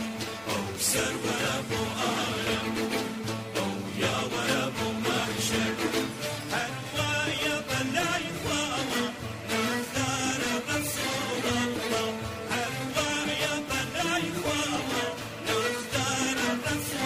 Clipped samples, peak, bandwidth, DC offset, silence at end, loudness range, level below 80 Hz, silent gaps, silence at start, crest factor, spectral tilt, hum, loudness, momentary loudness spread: under 0.1%; -14 dBFS; 16 kHz; under 0.1%; 0 s; 1 LU; -56 dBFS; none; 0 s; 16 dB; -3 dB/octave; none; -29 LUFS; 5 LU